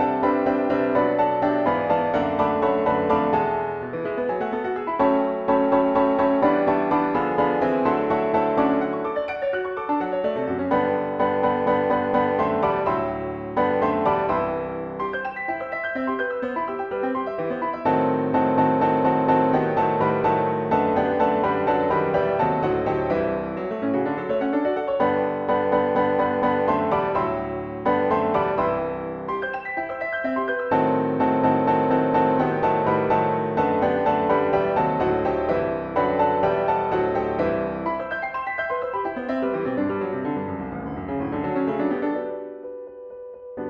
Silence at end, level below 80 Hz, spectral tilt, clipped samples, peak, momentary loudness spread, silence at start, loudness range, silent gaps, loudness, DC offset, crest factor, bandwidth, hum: 0 s; -50 dBFS; -9 dB/octave; under 0.1%; -6 dBFS; 8 LU; 0 s; 5 LU; none; -23 LUFS; under 0.1%; 16 dB; 6.6 kHz; none